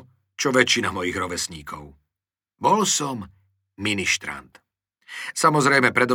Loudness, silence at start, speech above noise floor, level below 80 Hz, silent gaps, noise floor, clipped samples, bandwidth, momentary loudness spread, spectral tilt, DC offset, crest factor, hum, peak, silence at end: -21 LUFS; 0.4 s; 67 dB; -58 dBFS; none; -89 dBFS; under 0.1%; 20 kHz; 19 LU; -3 dB/octave; under 0.1%; 22 dB; none; -2 dBFS; 0 s